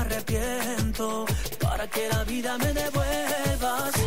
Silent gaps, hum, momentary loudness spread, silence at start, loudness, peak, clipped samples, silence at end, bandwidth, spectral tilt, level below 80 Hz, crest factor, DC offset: none; none; 2 LU; 0 s; -27 LUFS; -14 dBFS; under 0.1%; 0 s; 16.5 kHz; -4.5 dB/octave; -34 dBFS; 12 dB; 1%